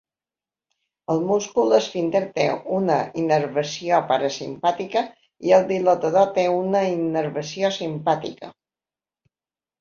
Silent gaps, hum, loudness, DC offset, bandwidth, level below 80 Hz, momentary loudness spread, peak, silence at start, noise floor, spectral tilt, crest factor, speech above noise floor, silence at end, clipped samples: none; none; -22 LUFS; under 0.1%; 7.2 kHz; -66 dBFS; 8 LU; -4 dBFS; 1.1 s; under -90 dBFS; -5.5 dB/octave; 18 dB; over 69 dB; 1.3 s; under 0.1%